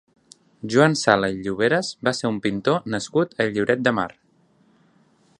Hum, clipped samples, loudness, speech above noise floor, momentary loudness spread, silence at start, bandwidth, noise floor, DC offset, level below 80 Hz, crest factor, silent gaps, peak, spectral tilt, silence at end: none; under 0.1%; -21 LUFS; 39 dB; 7 LU; 0.65 s; 11 kHz; -60 dBFS; under 0.1%; -58 dBFS; 22 dB; none; 0 dBFS; -5 dB/octave; 1.3 s